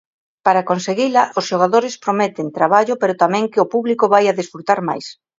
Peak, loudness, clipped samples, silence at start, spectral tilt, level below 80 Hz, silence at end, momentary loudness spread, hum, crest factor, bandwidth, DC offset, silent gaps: 0 dBFS; -17 LUFS; under 0.1%; 0.45 s; -5 dB/octave; -66 dBFS; 0.25 s; 6 LU; none; 16 dB; 7.8 kHz; under 0.1%; none